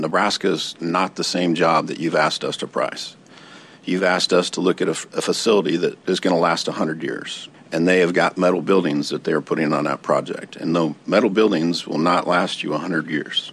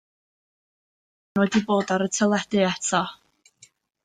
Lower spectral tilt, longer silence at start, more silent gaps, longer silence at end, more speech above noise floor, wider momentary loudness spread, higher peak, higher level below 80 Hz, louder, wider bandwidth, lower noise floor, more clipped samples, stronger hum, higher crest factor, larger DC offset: about the same, -4.5 dB/octave vs -4.5 dB/octave; second, 0 s vs 1.35 s; neither; second, 0 s vs 0.9 s; second, 24 dB vs 35 dB; first, 8 LU vs 4 LU; first, -4 dBFS vs -8 dBFS; second, -70 dBFS vs -64 dBFS; first, -20 LUFS vs -23 LUFS; first, 13 kHz vs 9.6 kHz; second, -44 dBFS vs -57 dBFS; neither; neither; about the same, 16 dB vs 18 dB; neither